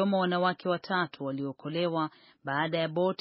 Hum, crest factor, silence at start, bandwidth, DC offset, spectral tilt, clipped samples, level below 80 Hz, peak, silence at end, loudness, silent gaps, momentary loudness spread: none; 16 dB; 0 s; 5.8 kHz; under 0.1%; -4 dB/octave; under 0.1%; -78 dBFS; -14 dBFS; 0.05 s; -30 LUFS; none; 8 LU